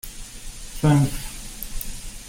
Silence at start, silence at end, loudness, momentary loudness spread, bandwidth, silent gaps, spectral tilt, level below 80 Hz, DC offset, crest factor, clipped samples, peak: 0.05 s; 0 s; -24 LUFS; 19 LU; 16.5 kHz; none; -6 dB/octave; -36 dBFS; under 0.1%; 20 dB; under 0.1%; -6 dBFS